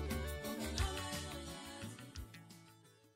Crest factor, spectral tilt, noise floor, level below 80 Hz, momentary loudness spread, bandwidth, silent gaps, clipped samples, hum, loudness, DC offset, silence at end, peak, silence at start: 18 dB; -4 dB/octave; -65 dBFS; -50 dBFS; 19 LU; 16 kHz; none; under 0.1%; none; -44 LUFS; under 0.1%; 0.05 s; -26 dBFS; 0 s